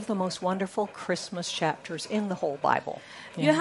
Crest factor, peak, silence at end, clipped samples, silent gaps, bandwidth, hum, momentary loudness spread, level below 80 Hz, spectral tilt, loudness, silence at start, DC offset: 22 dB; -8 dBFS; 0 s; under 0.1%; none; 11.5 kHz; none; 7 LU; -74 dBFS; -4.5 dB/octave; -30 LUFS; 0 s; under 0.1%